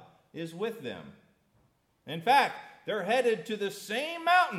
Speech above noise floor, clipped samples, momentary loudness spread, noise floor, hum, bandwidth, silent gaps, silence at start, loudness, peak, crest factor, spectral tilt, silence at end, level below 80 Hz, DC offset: 40 dB; under 0.1%; 17 LU; -70 dBFS; none; 16 kHz; none; 0.35 s; -29 LUFS; -10 dBFS; 20 dB; -4 dB/octave; 0 s; -80 dBFS; under 0.1%